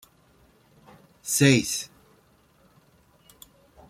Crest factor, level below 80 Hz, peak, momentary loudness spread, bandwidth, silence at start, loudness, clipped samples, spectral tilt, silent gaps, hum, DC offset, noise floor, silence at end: 26 dB; -62 dBFS; -4 dBFS; 21 LU; 16 kHz; 1.25 s; -22 LUFS; under 0.1%; -4 dB/octave; none; none; under 0.1%; -61 dBFS; 2.05 s